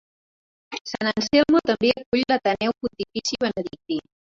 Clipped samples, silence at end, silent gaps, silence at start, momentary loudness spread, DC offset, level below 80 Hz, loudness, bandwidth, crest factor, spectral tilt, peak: under 0.1%; 0.35 s; 0.81-0.85 s, 2.06-2.12 s; 0.7 s; 12 LU; under 0.1%; -56 dBFS; -23 LUFS; 7.8 kHz; 18 dB; -4 dB/octave; -6 dBFS